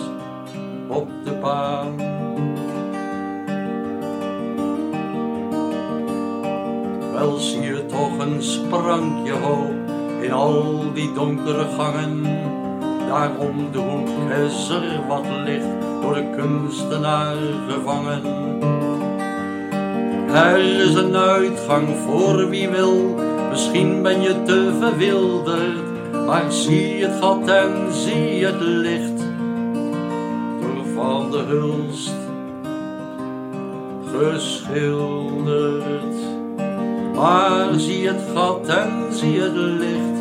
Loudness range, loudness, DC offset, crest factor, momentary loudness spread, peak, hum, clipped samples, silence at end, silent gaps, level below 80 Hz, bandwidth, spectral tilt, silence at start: 7 LU; -21 LUFS; under 0.1%; 18 dB; 10 LU; -2 dBFS; none; under 0.1%; 0 s; none; -64 dBFS; 15 kHz; -5.5 dB/octave; 0 s